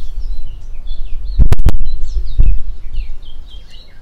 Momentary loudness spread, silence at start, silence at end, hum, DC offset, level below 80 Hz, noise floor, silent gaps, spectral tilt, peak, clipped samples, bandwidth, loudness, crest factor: 20 LU; 0 s; 0 s; none; under 0.1%; -14 dBFS; -29 dBFS; none; -7 dB/octave; 0 dBFS; under 0.1%; 4.3 kHz; -21 LUFS; 8 dB